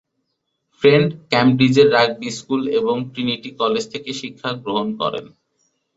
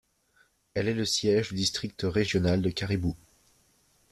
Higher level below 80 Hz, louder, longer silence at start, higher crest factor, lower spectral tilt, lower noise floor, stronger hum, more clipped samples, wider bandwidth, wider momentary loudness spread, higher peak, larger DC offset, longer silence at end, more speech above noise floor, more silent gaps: about the same, -58 dBFS vs -54 dBFS; first, -18 LUFS vs -28 LUFS; about the same, 0.8 s vs 0.75 s; about the same, 18 dB vs 16 dB; about the same, -5.5 dB/octave vs -5 dB/octave; first, -74 dBFS vs -67 dBFS; neither; neither; second, 8 kHz vs 14 kHz; first, 13 LU vs 7 LU; first, -2 dBFS vs -12 dBFS; neither; second, 0.7 s vs 0.95 s; first, 56 dB vs 39 dB; neither